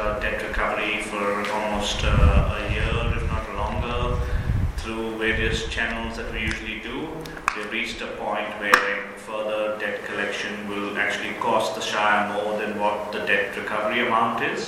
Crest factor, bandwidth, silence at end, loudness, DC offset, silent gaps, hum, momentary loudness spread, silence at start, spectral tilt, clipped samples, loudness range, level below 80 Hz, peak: 24 dB; 16 kHz; 0 s; -24 LUFS; under 0.1%; none; none; 9 LU; 0 s; -5 dB/octave; under 0.1%; 3 LU; -30 dBFS; 0 dBFS